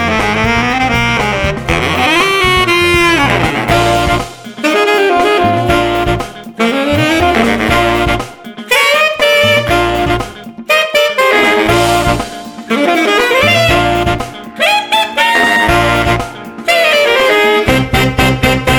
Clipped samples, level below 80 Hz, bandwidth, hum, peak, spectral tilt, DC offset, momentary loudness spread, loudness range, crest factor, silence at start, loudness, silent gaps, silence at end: under 0.1%; -28 dBFS; over 20 kHz; none; 0 dBFS; -4.5 dB/octave; under 0.1%; 8 LU; 2 LU; 12 dB; 0 s; -10 LUFS; none; 0 s